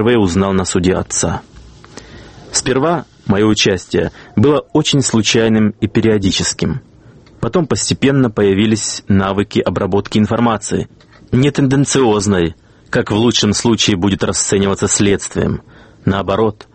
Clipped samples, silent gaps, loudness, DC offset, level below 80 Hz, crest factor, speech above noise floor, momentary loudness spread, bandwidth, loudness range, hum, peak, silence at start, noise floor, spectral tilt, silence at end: under 0.1%; none; -14 LUFS; under 0.1%; -40 dBFS; 14 dB; 28 dB; 8 LU; 8.8 kHz; 3 LU; none; 0 dBFS; 0 s; -42 dBFS; -4.5 dB/octave; 0.25 s